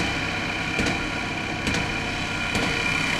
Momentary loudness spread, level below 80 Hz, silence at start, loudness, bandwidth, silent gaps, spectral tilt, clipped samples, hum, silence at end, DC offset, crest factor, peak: 4 LU; -40 dBFS; 0 s; -25 LUFS; 15.5 kHz; none; -3.5 dB/octave; under 0.1%; none; 0 s; under 0.1%; 16 dB; -10 dBFS